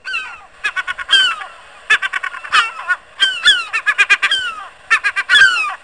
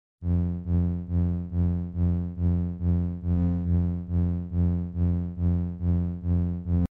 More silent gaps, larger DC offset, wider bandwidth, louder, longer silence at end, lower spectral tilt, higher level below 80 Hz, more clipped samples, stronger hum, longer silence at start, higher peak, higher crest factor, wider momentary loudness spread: neither; first, 0.3% vs under 0.1%; first, 10.5 kHz vs 2.1 kHz; first, -13 LUFS vs -27 LUFS; about the same, 0.1 s vs 0.05 s; second, 2.5 dB/octave vs -12.5 dB/octave; second, -56 dBFS vs -36 dBFS; neither; neither; second, 0.05 s vs 0.2 s; first, -2 dBFS vs -14 dBFS; first, 16 dB vs 10 dB; first, 13 LU vs 2 LU